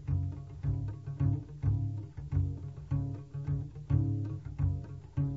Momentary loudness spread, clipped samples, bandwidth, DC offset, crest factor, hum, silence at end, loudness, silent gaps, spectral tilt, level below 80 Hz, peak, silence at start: 8 LU; under 0.1%; 3.1 kHz; under 0.1%; 18 dB; none; 0 s; -35 LUFS; none; -11.5 dB/octave; -44 dBFS; -16 dBFS; 0 s